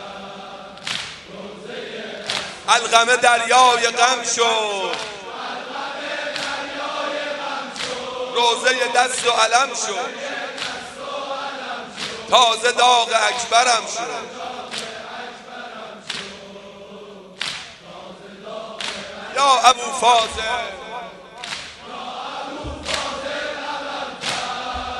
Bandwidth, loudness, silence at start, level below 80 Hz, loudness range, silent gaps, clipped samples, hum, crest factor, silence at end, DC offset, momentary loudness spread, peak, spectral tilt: 11.5 kHz; -20 LUFS; 0 s; -52 dBFS; 14 LU; none; under 0.1%; none; 22 dB; 0 s; under 0.1%; 20 LU; 0 dBFS; -0.5 dB/octave